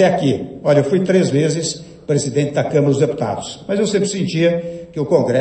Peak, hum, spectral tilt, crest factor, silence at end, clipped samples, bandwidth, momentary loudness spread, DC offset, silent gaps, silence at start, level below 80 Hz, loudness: -2 dBFS; none; -6 dB/octave; 16 dB; 0 s; under 0.1%; 8.8 kHz; 9 LU; under 0.1%; none; 0 s; -54 dBFS; -17 LUFS